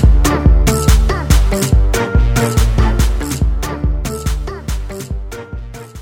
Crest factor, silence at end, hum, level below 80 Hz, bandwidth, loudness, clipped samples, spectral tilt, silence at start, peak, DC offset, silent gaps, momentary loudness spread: 12 dB; 0 s; none; -14 dBFS; 17 kHz; -15 LUFS; under 0.1%; -5.5 dB/octave; 0 s; 0 dBFS; under 0.1%; none; 14 LU